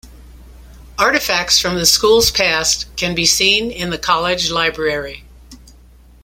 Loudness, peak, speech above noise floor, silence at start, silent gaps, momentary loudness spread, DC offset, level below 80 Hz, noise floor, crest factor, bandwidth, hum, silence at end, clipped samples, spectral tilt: -14 LUFS; 0 dBFS; 28 dB; 0.05 s; none; 10 LU; under 0.1%; -38 dBFS; -44 dBFS; 18 dB; 16.5 kHz; none; 0.65 s; under 0.1%; -1.5 dB/octave